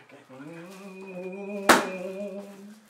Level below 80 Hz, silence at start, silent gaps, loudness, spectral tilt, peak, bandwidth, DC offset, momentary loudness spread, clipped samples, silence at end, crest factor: -68 dBFS; 0 s; none; -26 LUFS; -3 dB/octave; -2 dBFS; 16 kHz; under 0.1%; 23 LU; under 0.1%; 0.1 s; 28 dB